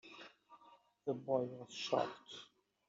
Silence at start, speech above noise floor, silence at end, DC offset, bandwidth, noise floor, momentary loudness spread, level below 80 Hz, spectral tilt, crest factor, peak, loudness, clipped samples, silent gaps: 0.05 s; 27 dB; 0.45 s; under 0.1%; 7.6 kHz; -67 dBFS; 18 LU; -88 dBFS; -3.5 dB/octave; 22 dB; -20 dBFS; -41 LUFS; under 0.1%; none